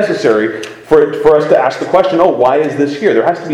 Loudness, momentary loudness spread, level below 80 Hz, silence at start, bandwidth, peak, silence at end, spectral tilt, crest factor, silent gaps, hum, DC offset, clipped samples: -11 LUFS; 5 LU; -46 dBFS; 0 s; 11 kHz; 0 dBFS; 0 s; -6 dB/octave; 10 dB; none; none; under 0.1%; 0.3%